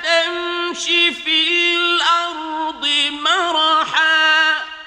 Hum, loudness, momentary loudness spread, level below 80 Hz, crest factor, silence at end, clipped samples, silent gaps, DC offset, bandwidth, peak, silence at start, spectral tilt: none; -15 LUFS; 8 LU; -60 dBFS; 16 dB; 0 s; under 0.1%; none; under 0.1%; 11 kHz; -2 dBFS; 0 s; 0.5 dB/octave